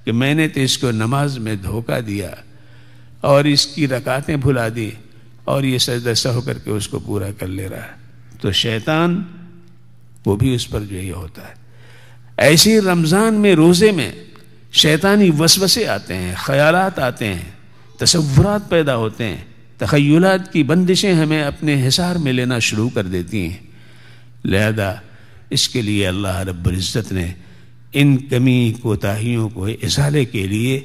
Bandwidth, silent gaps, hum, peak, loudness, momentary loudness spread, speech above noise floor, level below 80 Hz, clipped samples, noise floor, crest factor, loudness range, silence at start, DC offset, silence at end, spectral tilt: 15.5 kHz; none; none; 0 dBFS; -16 LUFS; 13 LU; 31 dB; -42 dBFS; under 0.1%; -47 dBFS; 18 dB; 7 LU; 0.05 s; 0.8%; 0 s; -4.5 dB/octave